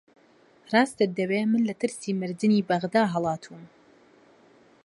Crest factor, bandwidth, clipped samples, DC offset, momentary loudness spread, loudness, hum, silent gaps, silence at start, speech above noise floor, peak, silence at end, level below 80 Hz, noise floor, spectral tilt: 20 dB; 11.5 kHz; under 0.1%; under 0.1%; 7 LU; -25 LUFS; none; none; 0.7 s; 34 dB; -6 dBFS; 1.2 s; -70 dBFS; -59 dBFS; -6 dB/octave